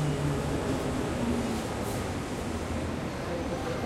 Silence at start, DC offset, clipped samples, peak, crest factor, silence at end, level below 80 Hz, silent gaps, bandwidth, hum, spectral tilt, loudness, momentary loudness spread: 0 s; under 0.1%; under 0.1%; -18 dBFS; 14 dB; 0 s; -44 dBFS; none; 16 kHz; none; -6 dB/octave; -32 LUFS; 4 LU